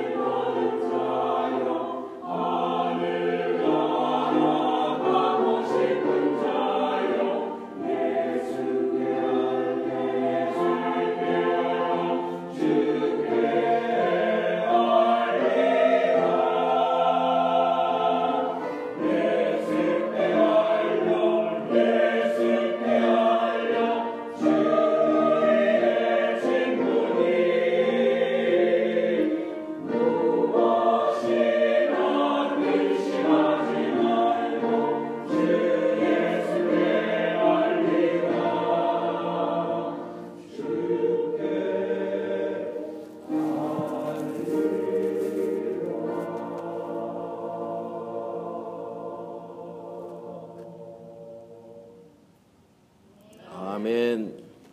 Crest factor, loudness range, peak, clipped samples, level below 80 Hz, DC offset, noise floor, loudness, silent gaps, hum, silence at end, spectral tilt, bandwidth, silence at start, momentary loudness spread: 16 dB; 11 LU; -8 dBFS; under 0.1%; -74 dBFS; under 0.1%; -59 dBFS; -24 LUFS; none; none; 0.25 s; -6.5 dB/octave; 11.5 kHz; 0 s; 12 LU